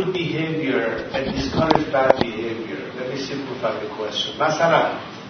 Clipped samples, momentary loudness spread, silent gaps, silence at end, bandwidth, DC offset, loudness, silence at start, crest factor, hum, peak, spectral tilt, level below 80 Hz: under 0.1%; 10 LU; none; 0 s; 6.6 kHz; under 0.1%; -22 LUFS; 0 s; 22 dB; none; 0 dBFS; -5.5 dB/octave; -46 dBFS